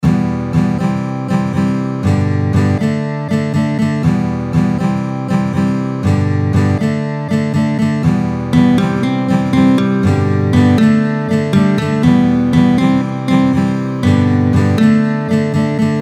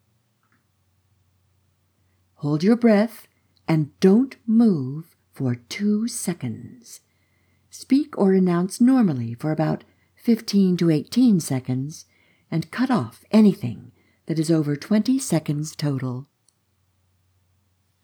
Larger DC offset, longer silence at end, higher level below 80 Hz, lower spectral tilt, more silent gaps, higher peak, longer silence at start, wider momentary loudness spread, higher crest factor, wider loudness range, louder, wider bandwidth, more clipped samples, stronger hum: neither; second, 0 s vs 1.8 s; first, -38 dBFS vs -72 dBFS; first, -8 dB/octave vs -6.5 dB/octave; neither; first, 0 dBFS vs -4 dBFS; second, 0 s vs 2.4 s; second, 6 LU vs 14 LU; second, 12 dB vs 18 dB; about the same, 3 LU vs 4 LU; first, -14 LUFS vs -21 LUFS; second, 12 kHz vs 20 kHz; neither; neither